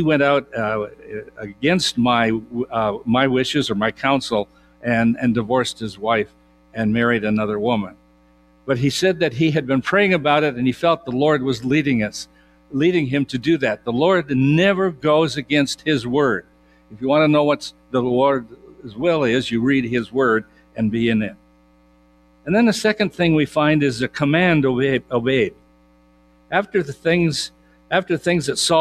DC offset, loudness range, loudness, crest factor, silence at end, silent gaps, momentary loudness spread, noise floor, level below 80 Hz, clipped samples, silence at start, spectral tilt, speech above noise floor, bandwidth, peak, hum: under 0.1%; 3 LU; -19 LUFS; 18 dB; 0 s; none; 9 LU; -54 dBFS; -52 dBFS; under 0.1%; 0 s; -5.5 dB/octave; 35 dB; 14 kHz; -2 dBFS; none